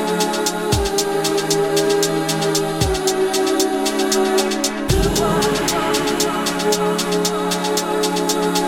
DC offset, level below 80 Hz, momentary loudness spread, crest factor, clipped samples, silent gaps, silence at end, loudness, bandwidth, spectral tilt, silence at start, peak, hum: under 0.1%; -34 dBFS; 2 LU; 16 dB; under 0.1%; none; 0 s; -18 LUFS; 17 kHz; -3.5 dB/octave; 0 s; -2 dBFS; none